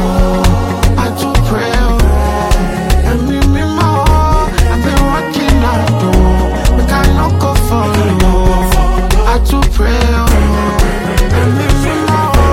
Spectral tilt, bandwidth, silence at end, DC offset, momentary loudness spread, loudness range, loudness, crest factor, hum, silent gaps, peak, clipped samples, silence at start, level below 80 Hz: -6 dB/octave; 16.5 kHz; 0 s; under 0.1%; 3 LU; 1 LU; -12 LUFS; 10 dB; none; none; 0 dBFS; under 0.1%; 0 s; -12 dBFS